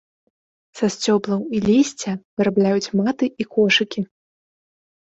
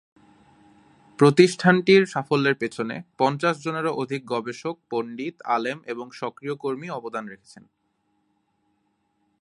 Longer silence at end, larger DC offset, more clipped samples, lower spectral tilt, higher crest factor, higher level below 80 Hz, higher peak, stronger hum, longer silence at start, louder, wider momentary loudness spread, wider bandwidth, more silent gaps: second, 1 s vs 2.05 s; neither; neither; about the same, -5 dB/octave vs -6 dB/octave; second, 16 dB vs 24 dB; first, -58 dBFS vs -70 dBFS; about the same, -4 dBFS vs -2 dBFS; neither; second, 0.75 s vs 1.2 s; first, -20 LUFS vs -23 LUFS; second, 10 LU vs 16 LU; second, 8.2 kHz vs 11.5 kHz; first, 2.25-2.37 s vs none